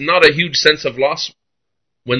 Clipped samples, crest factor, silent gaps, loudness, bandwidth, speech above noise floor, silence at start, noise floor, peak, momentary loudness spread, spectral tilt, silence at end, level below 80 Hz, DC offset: 0.2%; 16 dB; none; -14 LUFS; 11 kHz; 64 dB; 0 s; -79 dBFS; 0 dBFS; 11 LU; -3.5 dB/octave; 0 s; -52 dBFS; under 0.1%